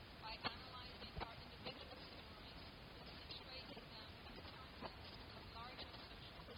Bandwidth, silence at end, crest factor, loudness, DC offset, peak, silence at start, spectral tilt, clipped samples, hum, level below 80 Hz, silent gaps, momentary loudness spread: 18 kHz; 0 s; 26 dB; -53 LUFS; under 0.1%; -28 dBFS; 0 s; -5.5 dB/octave; under 0.1%; none; -64 dBFS; none; 7 LU